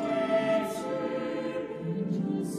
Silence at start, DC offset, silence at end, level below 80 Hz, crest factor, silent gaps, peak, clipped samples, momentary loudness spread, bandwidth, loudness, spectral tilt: 0 s; under 0.1%; 0 s; -68 dBFS; 14 dB; none; -16 dBFS; under 0.1%; 8 LU; 15 kHz; -30 LUFS; -6.5 dB/octave